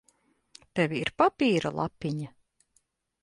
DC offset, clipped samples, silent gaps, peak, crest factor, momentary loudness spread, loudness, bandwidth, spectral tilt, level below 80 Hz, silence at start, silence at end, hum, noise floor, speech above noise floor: under 0.1%; under 0.1%; none; -8 dBFS; 22 dB; 12 LU; -28 LUFS; 11.5 kHz; -6 dB/octave; -62 dBFS; 0.75 s; 0.95 s; none; -72 dBFS; 45 dB